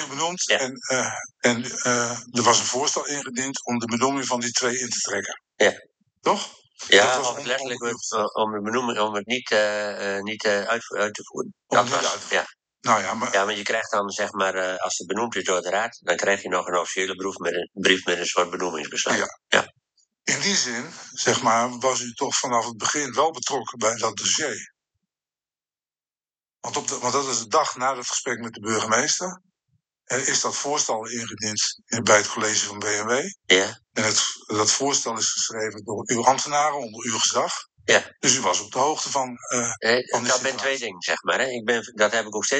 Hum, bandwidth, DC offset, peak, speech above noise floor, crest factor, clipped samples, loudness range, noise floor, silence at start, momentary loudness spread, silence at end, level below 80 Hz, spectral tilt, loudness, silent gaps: none; 9.6 kHz; under 0.1%; 0 dBFS; over 66 dB; 24 dB; under 0.1%; 3 LU; under -90 dBFS; 0 s; 8 LU; 0 s; -74 dBFS; -1.5 dB/octave; -23 LUFS; none